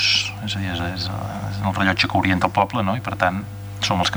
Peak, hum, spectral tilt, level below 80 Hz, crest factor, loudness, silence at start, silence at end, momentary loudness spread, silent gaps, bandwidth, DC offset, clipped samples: -2 dBFS; none; -4.5 dB/octave; -46 dBFS; 20 dB; -21 LUFS; 0 s; 0 s; 9 LU; none; over 20 kHz; under 0.1%; under 0.1%